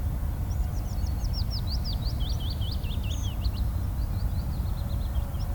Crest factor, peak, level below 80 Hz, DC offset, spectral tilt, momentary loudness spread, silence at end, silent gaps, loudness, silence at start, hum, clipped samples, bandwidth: 12 dB; -16 dBFS; -30 dBFS; under 0.1%; -6 dB/octave; 1 LU; 0 s; none; -31 LUFS; 0 s; none; under 0.1%; 19.5 kHz